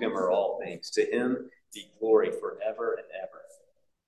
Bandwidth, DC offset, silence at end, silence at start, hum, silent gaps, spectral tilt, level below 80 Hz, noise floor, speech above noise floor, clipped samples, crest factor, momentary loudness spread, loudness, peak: 12 kHz; under 0.1%; 0.65 s; 0 s; none; none; -4.5 dB/octave; -78 dBFS; -68 dBFS; 39 dB; under 0.1%; 20 dB; 18 LU; -29 LUFS; -10 dBFS